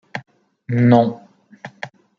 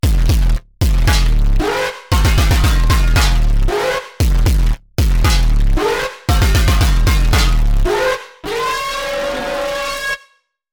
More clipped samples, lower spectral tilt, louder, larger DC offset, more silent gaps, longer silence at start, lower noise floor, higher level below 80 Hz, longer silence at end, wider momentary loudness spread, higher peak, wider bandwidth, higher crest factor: neither; first, -9 dB/octave vs -5 dB/octave; about the same, -16 LUFS vs -16 LUFS; neither; neither; about the same, 0.15 s vs 0.05 s; second, -41 dBFS vs -54 dBFS; second, -64 dBFS vs -14 dBFS; second, 0.3 s vs 0.55 s; first, 25 LU vs 6 LU; about the same, -2 dBFS vs -4 dBFS; second, 6.8 kHz vs 20 kHz; first, 18 dB vs 10 dB